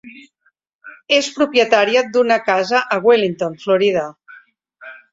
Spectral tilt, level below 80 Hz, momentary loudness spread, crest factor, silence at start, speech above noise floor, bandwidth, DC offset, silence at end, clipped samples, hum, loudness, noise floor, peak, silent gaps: -3.5 dB/octave; -64 dBFS; 7 LU; 16 dB; 0.05 s; 48 dB; 7.8 kHz; under 0.1%; 0.15 s; under 0.1%; none; -16 LUFS; -64 dBFS; -2 dBFS; 0.75-0.79 s